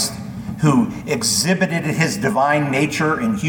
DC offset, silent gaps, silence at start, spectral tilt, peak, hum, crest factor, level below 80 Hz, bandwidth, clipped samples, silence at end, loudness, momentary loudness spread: under 0.1%; none; 0 s; -4.5 dB/octave; -2 dBFS; none; 16 dB; -48 dBFS; 19 kHz; under 0.1%; 0 s; -18 LUFS; 5 LU